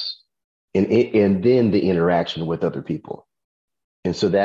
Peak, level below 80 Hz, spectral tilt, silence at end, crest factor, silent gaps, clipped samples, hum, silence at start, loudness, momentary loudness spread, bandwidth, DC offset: -6 dBFS; -50 dBFS; -7.5 dB/octave; 0 s; 16 dB; 0.44-0.68 s, 3.44-3.68 s, 3.84-4.03 s; under 0.1%; none; 0 s; -20 LUFS; 13 LU; 7.6 kHz; under 0.1%